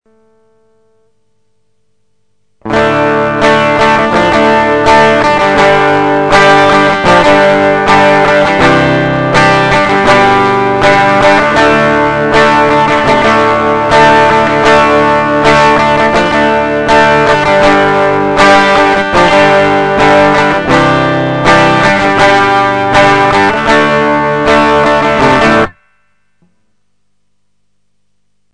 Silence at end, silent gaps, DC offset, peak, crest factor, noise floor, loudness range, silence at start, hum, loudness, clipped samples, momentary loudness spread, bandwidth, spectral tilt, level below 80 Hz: 2.85 s; none; 0.6%; 0 dBFS; 8 dB; -66 dBFS; 4 LU; 2.65 s; 50 Hz at -40 dBFS; -7 LUFS; 1%; 4 LU; 10 kHz; -5 dB/octave; -32 dBFS